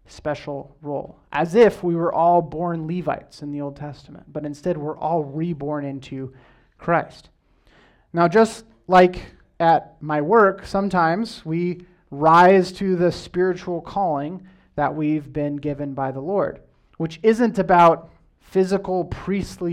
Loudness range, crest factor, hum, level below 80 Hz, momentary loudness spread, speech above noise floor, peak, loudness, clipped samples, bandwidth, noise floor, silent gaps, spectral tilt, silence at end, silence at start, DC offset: 9 LU; 16 dB; none; -50 dBFS; 17 LU; 36 dB; -4 dBFS; -20 LUFS; under 0.1%; 12.5 kHz; -56 dBFS; none; -7 dB/octave; 0 s; 0.1 s; under 0.1%